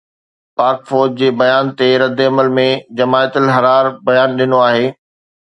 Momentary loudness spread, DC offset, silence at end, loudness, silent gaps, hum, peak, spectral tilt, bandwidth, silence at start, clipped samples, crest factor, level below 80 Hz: 4 LU; under 0.1%; 0.5 s; -13 LUFS; none; none; 0 dBFS; -6.5 dB/octave; 8.8 kHz; 0.6 s; under 0.1%; 14 dB; -62 dBFS